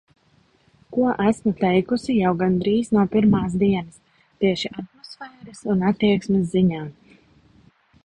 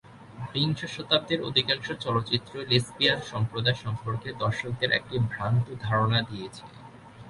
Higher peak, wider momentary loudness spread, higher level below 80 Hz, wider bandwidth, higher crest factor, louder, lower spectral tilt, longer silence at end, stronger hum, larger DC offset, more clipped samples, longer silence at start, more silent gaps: about the same, -6 dBFS vs -6 dBFS; first, 18 LU vs 9 LU; about the same, -52 dBFS vs -56 dBFS; second, 10 kHz vs 11.5 kHz; second, 16 dB vs 22 dB; first, -21 LUFS vs -27 LUFS; first, -7.5 dB/octave vs -5.5 dB/octave; first, 1.15 s vs 0 s; neither; neither; neither; first, 0.9 s vs 0.05 s; neither